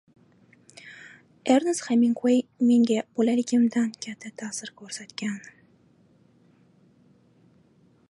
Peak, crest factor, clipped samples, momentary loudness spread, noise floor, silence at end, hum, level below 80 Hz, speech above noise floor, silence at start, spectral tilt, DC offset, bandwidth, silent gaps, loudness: -8 dBFS; 20 dB; under 0.1%; 19 LU; -60 dBFS; 2.7 s; none; -78 dBFS; 36 dB; 0.85 s; -4.5 dB/octave; under 0.1%; 11.5 kHz; none; -25 LUFS